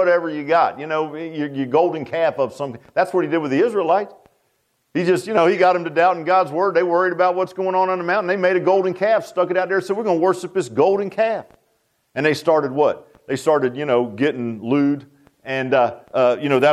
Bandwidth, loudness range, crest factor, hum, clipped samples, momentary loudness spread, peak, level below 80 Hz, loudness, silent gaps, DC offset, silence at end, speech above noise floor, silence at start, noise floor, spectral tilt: 13 kHz; 3 LU; 16 dB; none; under 0.1%; 8 LU; -4 dBFS; -68 dBFS; -19 LUFS; none; under 0.1%; 0 s; 49 dB; 0 s; -67 dBFS; -6 dB/octave